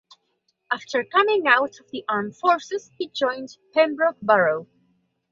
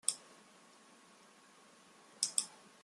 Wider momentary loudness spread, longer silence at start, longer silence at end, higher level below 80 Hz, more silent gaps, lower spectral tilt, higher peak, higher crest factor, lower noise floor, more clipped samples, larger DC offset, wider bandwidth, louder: second, 12 LU vs 26 LU; first, 0.7 s vs 0.05 s; first, 0.65 s vs 0.3 s; first, -72 dBFS vs under -90 dBFS; neither; first, -4 dB/octave vs 1.5 dB/octave; first, -2 dBFS vs -10 dBFS; second, 20 dB vs 34 dB; first, -72 dBFS vs -63 dBFS; neither; neither; second, 7.6 kHz vs 14.5 kHz; first, -22 LUFS vs -38 LUFS